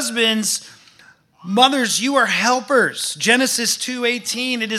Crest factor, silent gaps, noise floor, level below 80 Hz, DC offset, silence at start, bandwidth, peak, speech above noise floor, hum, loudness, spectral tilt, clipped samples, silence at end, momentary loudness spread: 18 dB; none; -50 dBFS; -74 dBFS; under 0.1%; 0 s; 15.5 kHz; 0 dBFS; 32 dB; none; -17 LUFS; -1.5 dB/octave; under 0.1%; 0 s; 6 LU